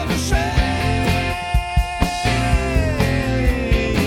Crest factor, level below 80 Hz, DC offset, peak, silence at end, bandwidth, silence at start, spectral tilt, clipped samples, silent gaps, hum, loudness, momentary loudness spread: 16 dB; -22 dBFS; under 0.1%; -2 dBFS; 0 s; 16 kHz; 0 s; -5.5 dB/octave; under 0.1%; none; none; -19 LUFS; 2 LU